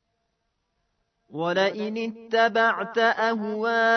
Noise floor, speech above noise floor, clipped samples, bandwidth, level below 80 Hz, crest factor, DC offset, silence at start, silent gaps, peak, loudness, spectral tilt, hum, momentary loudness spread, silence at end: -76 dBFS; 53 dB; under 0.1%; 6.4 kHz; -78 dBFS; 18 dB; under 0.1%; 1.3 s; none; -8 dBFS; -24 LUFS; -4.5 dB/octave; none; 9 LU; 0 s